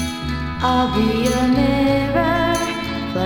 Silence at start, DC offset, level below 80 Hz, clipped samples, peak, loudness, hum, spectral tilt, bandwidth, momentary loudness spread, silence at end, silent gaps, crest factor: 0 s; under 0.1%; -34 dBFS; under 0.1%; -4 dBFS; -18 LUFS; none; -5.5 dB/octave; 19.5 kHz; 7 LU; 0 s; none; 14 dB